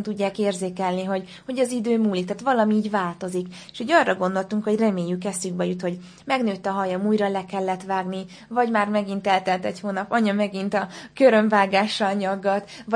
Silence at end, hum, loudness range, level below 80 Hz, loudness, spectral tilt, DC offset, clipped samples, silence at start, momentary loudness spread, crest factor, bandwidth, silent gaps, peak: 0 s; none; 3 LU; -66 dBFS; -23 LUFS; -5.5 dB/octave; under 0.1%; under 0.1%; 0 s; 10 LU; 20 dB; 10.5 kHz; none; -4 dBFS